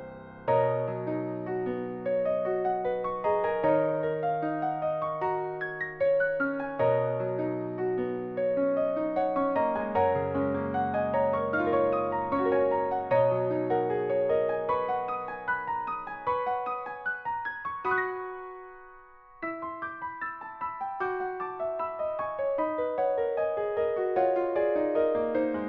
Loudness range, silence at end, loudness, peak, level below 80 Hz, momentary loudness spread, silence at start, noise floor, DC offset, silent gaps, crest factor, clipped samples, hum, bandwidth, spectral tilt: 7 LU; 0 s; -29 LUFS; -14 dBFS; -62 dBFS; 8 LU; 0 s; -52 dBFS; under 0.1%; none; 16 dB; under 0.1%; none; 4.7 kHz; -6 dB/octave